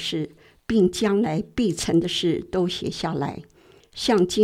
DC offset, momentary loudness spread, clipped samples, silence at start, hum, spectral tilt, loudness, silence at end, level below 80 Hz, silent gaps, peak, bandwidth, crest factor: under 0.1%; 12 LU; under 0.1%; 0 s; none; -5 dB/octave; -23 LUFS; 0 s; -50 dBFS; none; -6 dBFS; 15.5 kHz; 16 dB